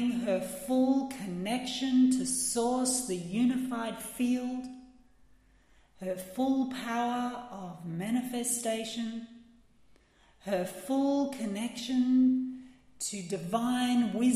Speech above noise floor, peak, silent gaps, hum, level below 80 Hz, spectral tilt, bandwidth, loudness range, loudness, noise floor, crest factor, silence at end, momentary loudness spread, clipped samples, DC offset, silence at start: 32 dB; -16 dBFS; none; none; -66 dBFS; -4 dB/octave; 15.5 kHz; 6 LU; -31 LUFS; -63 dBFS; 14 dB; 0 s; 13 LU; under 0.1%; under 0.1%; 0 s